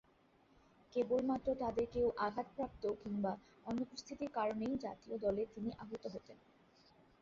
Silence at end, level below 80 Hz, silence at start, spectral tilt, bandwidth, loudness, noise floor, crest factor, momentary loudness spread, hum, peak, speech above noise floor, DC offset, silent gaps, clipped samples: 0.85 s; -66 dBFS; 0.9 s; -5.5 dB/octave; 7.6 kHz; -41 LUFS; -71 dBFS; 16 dB; 10 LU; none; -24 dBFS; 31 dB; under 0.1%; none; under 0.1%